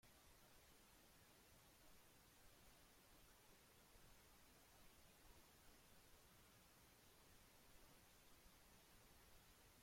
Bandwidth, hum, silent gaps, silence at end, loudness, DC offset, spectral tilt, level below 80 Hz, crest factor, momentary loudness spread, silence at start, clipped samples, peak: 16.5 kHz; none; none; 0 s; -70 LUFS; under 0.1%; -2.5 dB/octave; -78 dBFS; 16 dB; 0 LU; 0 s; under 0.1%; -54 dBFS